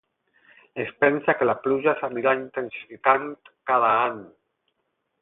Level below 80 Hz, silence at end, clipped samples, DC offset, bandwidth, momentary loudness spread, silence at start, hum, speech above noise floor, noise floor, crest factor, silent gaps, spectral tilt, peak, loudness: -68 dBFS; 0.95 s; under 0.1%; under 0.1%; 4 kHz; 15 LU; 0.75 s; none; 53 dB; -76 dBFS; 22 dB; none; -9.5 dB/octave; -2 dBFS; -23 LUFS